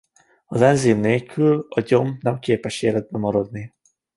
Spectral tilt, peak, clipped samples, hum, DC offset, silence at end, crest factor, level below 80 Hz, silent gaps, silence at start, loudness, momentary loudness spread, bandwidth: -6.5 dB/octave; -2 dBFS; under 0.1%; none; under 0.1%; 0.5 s; 18 dB; -56 dBFS; none; 0.5 s; -20 LUFS; 10 LU; 11.5 kHz